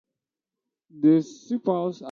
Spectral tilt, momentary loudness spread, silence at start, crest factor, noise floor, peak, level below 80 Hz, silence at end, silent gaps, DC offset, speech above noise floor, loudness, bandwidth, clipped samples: -8 dB/octave; 8 LU; 0.95 s; 16 dB; -88 dBFS; -10 dBFS; -74 dBFS; 0 s; none; under 0.1%; 65 dB; -24 LUFS; 7.2 kHz; under 0.1%